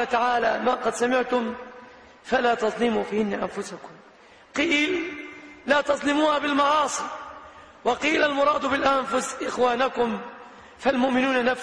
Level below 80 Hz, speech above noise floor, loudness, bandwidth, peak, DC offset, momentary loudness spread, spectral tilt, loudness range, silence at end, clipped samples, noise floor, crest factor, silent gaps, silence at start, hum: -58 dBFS; 28 dB; -23 LUFS; 11 kHz; -10 dBFS; under 0.1%; 16 LU; -3.5 dB/octave; 3 LU; 0 s; under 0.1%; -51 dBFS; 14 dB; none; 0 s; none